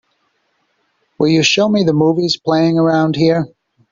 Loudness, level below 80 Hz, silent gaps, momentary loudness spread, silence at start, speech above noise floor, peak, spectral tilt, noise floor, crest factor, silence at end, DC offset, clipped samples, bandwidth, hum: -14 LUFS; -54 dBFS; none; 6 LU; 1.2 s; 51 dB; 0 dBFS; -5.5 dB/octave; -64 dBFS; 14 dB; 0.45 s; under 0.1%; under 0.1%; 7.6 kHz; none